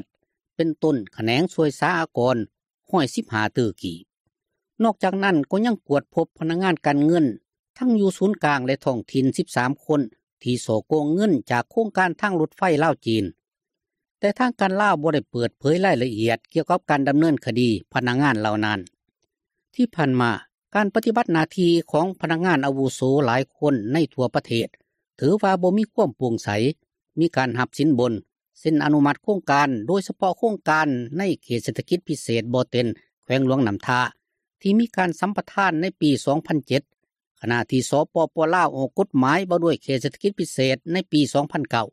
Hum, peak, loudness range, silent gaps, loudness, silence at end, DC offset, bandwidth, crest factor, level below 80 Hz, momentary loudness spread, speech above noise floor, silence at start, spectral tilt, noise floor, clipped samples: none; -6 dBFS; 2 LU; 4.20-4.25 s, 7.59-7.74 s, 10.23-10.37 s, 14.11-14.15 s, 33.13-33.22 s, 37.27-37.35 s; -22 LUFS; 0.05 s; under 0.1%; 14 kHz; 16 dB; -64 dBFS; 6 LU; 64 dB; 0.6 s; -6 dB/octave; -85 dBFS; under 0.1%